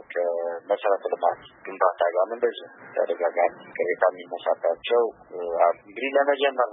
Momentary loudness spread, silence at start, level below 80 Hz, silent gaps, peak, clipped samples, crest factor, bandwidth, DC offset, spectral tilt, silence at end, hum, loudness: 8 LU; 0.1 s; -72 dBFS; none; -6 dBFS; under 0.1%; 18 dB; 3.9 kHz; under 0.1%; -7 dB/octave; 0 s; none; -25 LUFS